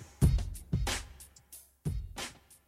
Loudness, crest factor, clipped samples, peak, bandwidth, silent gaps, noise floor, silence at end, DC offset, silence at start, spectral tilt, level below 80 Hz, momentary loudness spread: -35 LUFS; 22 dB; under 0.1%; -12 dBFS; 16 kHz; none; -56 dBFS; 0.35 s; under 0.1%; 0 s; -5 dB/octave; -38 dBFS; 22 LU